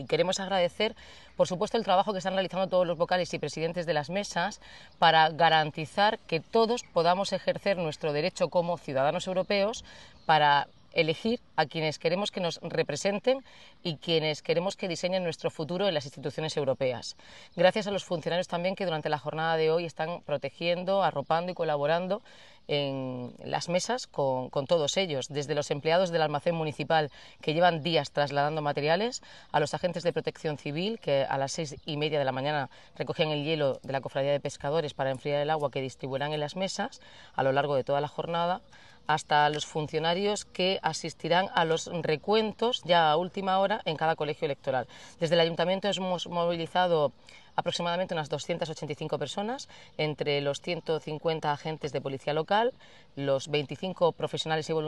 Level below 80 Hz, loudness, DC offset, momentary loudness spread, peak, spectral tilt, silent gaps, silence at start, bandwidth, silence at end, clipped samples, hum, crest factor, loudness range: -66 dBFS; -29 LUFS; 0.1%; 9 LU; -8 dBFS; -4.5 dB/octave; none; 0 s; 11.5 kHz; 0 s; under 0.1%; none; 22 dB; 4 LU